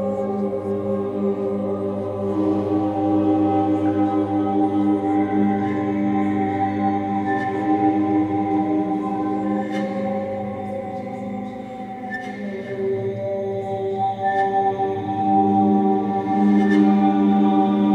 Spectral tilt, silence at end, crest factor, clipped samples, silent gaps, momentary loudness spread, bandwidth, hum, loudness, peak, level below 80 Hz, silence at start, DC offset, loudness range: -9 dB/octave; 0 s; 14 dB; under 0.1%; none; 11 LU; 6.8 kHz; 50 Hz at -45 dBFS; -21 LUFS; -6 dBFS; -60 dBFS; 0 s; under 0.1%; 9 LU